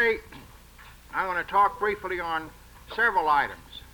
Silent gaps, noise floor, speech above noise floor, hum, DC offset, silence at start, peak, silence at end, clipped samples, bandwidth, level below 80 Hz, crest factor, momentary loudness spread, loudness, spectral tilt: none; -49 dBFS; 23 dB; none; under 0.1%; 0 s; -12 dBFS; 0.15 s; under 0.1%; over 20 kHz; -52 dBFS; 16 dB; 15 LU; -26 LUFS; -4 dB/octave